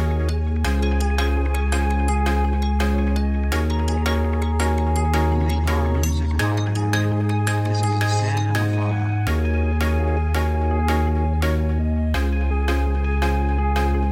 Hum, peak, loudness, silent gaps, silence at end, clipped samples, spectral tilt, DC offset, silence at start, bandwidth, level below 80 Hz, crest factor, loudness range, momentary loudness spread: none; -6 dBFS; -21 LUFS; none; 0 s; under 0.1%; -6.5 dB/octave; under 0.1%; 0 s; 15 kHz; -22 dBFS; 14 dB; 0 LU; 2 LU